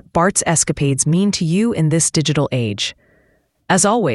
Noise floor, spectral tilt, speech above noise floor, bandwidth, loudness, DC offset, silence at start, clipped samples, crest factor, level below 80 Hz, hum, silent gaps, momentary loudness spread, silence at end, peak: -59 dBFS; -4 dB/octave; 43 dB; 12 kHz; -16 LUFS; under 0.1%; 0.15 s; under 0.1%; 16 dB; -46 dBFS; none; none; 5 LU; 0 s; 0 dBFS